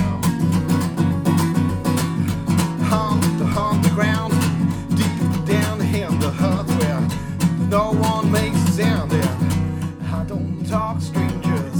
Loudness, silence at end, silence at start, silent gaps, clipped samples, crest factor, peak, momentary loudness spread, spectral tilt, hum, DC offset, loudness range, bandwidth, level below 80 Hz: -20 LUFS; 0 s; 0 s; none; under 0.1%; 14 dB; -4 dBFS; 4 LU; -6.5 dB/octave; none; under 0.1%; 1 LU; over 20 kHz; -40 dBFS